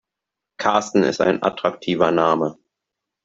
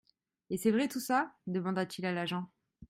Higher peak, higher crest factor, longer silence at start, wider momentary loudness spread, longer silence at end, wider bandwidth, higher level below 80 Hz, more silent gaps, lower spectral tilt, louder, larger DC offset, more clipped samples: first, -2 dBFS vs -16 dBFS; about the same, 18 dB vs 18 dB; about the same, 0.6 s vs 0.5 s; second, 6 LU vs 9 LU; first, 0.75 s vs 0.05 s; second, 7.8 kHz vs 16 kHz; first, -62 dBFS vs -72 dBFS; neither; about the same, -5 dB/octave vs -5.5 dB/octave; first, -20 LUFS vs -34 LUFS; neither; neither